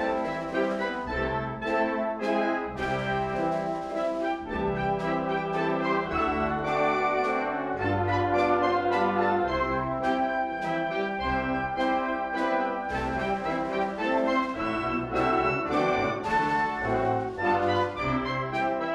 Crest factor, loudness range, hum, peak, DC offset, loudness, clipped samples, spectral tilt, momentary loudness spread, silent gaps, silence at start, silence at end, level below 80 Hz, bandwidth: 14 dB; 3 LU; none; -12 dBFS; under 0.1%; -27 LUFS; under 0.1%; -6.5 dB/octave; 5 LU; none; 0 s; 0 s; -48 dBFS; 11 kHz